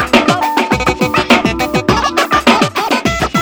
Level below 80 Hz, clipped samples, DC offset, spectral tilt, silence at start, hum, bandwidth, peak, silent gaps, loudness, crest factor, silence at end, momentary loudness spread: -32 dBFS; 0.2%; under 0.1%; -4.5 dB/octave; 0 s; none; over 20 kHz; 0 dBFS; none; -12 LUFS; 12 dB; 0 s; 4 LU